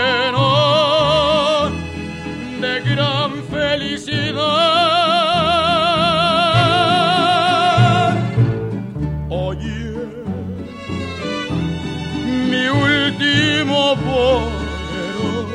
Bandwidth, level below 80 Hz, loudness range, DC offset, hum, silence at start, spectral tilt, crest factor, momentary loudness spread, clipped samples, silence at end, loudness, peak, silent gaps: 11 kHz; -36 dBFS; 9 LU; under 0.1%; none; 0 s; -5.5 dB/octave; 16 dB; 12 LU; under 0.1%; 0 s; -16 LUFS; 0 dBFS; none